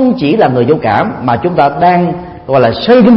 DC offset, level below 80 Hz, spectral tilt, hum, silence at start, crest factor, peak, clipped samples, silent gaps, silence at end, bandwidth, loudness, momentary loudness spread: under 0.1%; -42 dBFS; -9.5 dB/octave; none; 0 s; 8 dB; 0 dBFS; 0.3%; none; 0 s; 5.8 kHz; -10 LUFS; 5 LU